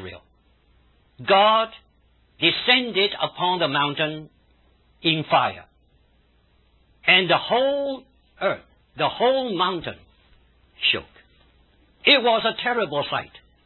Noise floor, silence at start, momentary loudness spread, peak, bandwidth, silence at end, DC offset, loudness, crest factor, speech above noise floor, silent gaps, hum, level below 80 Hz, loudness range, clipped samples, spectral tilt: -61 dBFS; 0 s; 14 LU; -4 dBFS; 4.3 kHz; 0.4 s; under 0.1%; -21 LUFS; 20 dB; 39 dB; none; none; -58 dBFS; 5 LU; under 0.1%; -8.5 dB/octave